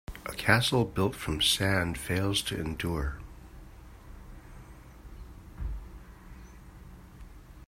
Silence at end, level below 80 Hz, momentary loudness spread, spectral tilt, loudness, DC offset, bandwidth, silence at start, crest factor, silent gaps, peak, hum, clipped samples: 0 s; -44 dBFS; 26 LU; -4 dB/octave; -29 LUFS; under 0.1%; 16 kHz; 0.1 s; 26 dB; none; -6 dBFS; none; under 0.1%